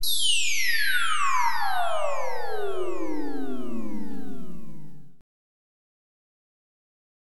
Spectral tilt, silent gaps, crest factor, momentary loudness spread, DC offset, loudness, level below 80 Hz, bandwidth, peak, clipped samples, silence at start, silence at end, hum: -1.5 dB/octave; none; 16 dB; 18 LU; 9%; -26 LUFS; -54 dBFS; 19 kHz; -10 dBFS; under 0.1%; 0 s; 2 s; none